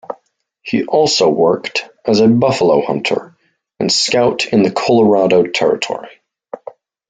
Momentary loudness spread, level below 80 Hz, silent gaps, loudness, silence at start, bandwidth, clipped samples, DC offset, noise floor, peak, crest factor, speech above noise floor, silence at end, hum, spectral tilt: 20 LU; -56 dBFS; none; -14 LUFS; 0.1 s; 9.4 kHz; under 0.1%; under 0.1%; -58 dBFS; -2 dBFS; 14 dB; 45 dB; 0.55 s; none; -4.5 dB/octave